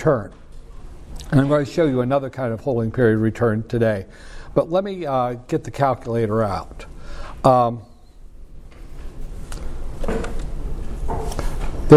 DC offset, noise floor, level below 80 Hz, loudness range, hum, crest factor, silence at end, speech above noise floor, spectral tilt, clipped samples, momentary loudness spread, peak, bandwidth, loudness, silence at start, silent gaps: under 0.1%; -41 dBFS; -30 dBFS; 11 LU; none; 20 dB; 0 s; 21 dB; -8 dB/octave; under 0.1%; 21 LU; 0 dBFS; 13.5 kHz; -22 LUFS; 0 s; none